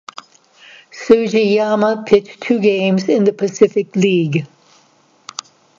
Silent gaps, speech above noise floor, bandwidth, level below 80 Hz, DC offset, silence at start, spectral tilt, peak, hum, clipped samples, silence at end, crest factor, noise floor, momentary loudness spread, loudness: none; 39 dB; 7.6 kHz; -60 dBFS; under 0.1%; 0.95 s; -6 dB/octave; 0 dBFS; none; under 0.1%; 1.35 s; 16 dB; -53 dBFS; 17 LU; -15 LUFS